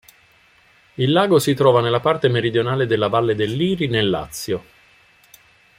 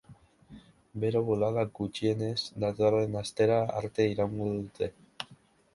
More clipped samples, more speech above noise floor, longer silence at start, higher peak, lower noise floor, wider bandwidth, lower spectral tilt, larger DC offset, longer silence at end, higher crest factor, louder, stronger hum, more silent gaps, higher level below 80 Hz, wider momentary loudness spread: neither; first, 36 dB vs 30 dB; first, 1 s vs 0.1 s; first, -2 dBFS vs -12 dBFS; second, -54 dBFS vs -59 dBFS; first, 16 kHz vs 11.5 kHz; about the same, -5.5 dB/octave vs -6.5 dB/octave; neither; first, 1.15 s vs 0.4 s; about the same, 18 dB vs 18 dB; first, -18 LUFS vs -30 LUFS; neither; neither; first, -54 dBFS vs -60 dBFS; about the same, 11 LU vs 13 LU